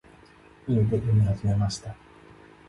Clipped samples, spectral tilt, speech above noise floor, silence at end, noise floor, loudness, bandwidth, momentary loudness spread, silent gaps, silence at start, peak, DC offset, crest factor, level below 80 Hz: under 0.1%; -7.5 dB/octave; 29 dB; 0.75 s; -53 dBFS; -25 LUFS; 11 kHz; 18 LU; none; 0.65 s; -14 dBFS; under 0.1%; 14 dB; -44 dBFS